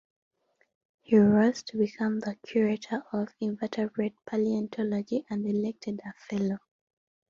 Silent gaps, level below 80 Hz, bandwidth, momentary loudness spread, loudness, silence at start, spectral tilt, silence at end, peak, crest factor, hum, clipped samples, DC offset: none; -68 dBFS; 7.2 kHz; 11 LU; -29 LUFS; 1.1 s; -7 dB/octave; 0.7 s; -10 dBFS; 20 dB; none; under 0.1%; under 0.1%